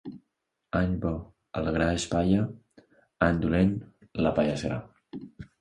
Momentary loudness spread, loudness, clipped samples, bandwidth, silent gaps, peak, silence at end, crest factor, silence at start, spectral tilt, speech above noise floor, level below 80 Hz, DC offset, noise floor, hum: 18 LU; -28 LUFS; under 0.1%; 11 kHz; none; -6 dBFS; 0.15 s; 22 dB; 0.05 s; -6.5 dB/octave; 53 dB; -44 dBFS; under 0.1%; -80 dBFS; none